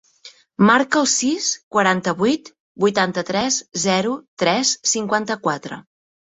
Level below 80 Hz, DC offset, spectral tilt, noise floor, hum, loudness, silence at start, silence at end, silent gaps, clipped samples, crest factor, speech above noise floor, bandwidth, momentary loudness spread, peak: -62 dBFS; under 0.1%; -3 dB/octave; -47 dBFS; none; -19 LUFS; 0.25 s; 0.5 s; 1.63-1.71 s, 2.60-2.75 s, 4.28-4.37 s; under 0.1%; 18 dB; 28 dB; 8.4 kHz; 9 LU; -2 dBFS